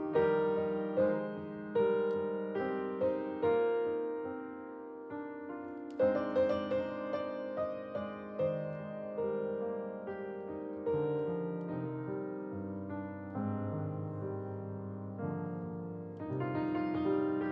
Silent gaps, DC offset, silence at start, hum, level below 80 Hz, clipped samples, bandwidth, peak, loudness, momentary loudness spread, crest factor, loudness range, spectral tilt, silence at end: none; under 0.1%; 0 s; none; -76 dBFS; under 0.1%; 5.8 kHz; -20 dBFS; -36 LUFS; 11 LU; 16 dB; 6 LU; -10 dB/octave; 0 s